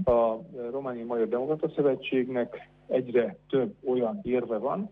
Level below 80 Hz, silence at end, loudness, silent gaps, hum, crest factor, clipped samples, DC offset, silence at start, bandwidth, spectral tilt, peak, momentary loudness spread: -56 dBFS; 0.05 s; -29 LUFS; none; 50 Hz at -60 dBFS; 16 dB; under 0.1%; under 0.1%; 0 s; 4.1 kHz; -9.5 dB/octave; -12 dBFS; 8 LU